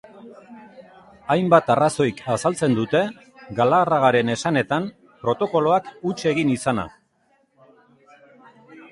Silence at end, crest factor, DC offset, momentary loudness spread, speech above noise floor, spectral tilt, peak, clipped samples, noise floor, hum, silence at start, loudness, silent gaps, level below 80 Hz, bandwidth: 0.05 s; 20 dB; under 0.1%; 12 LU; 43 dB; -5.5 dB/octave; -2 dBFS; under 0.1%; -64 dBFS; none; 0.15 s; -21 LUFS; none; -58 dBFS; 11.5 kHz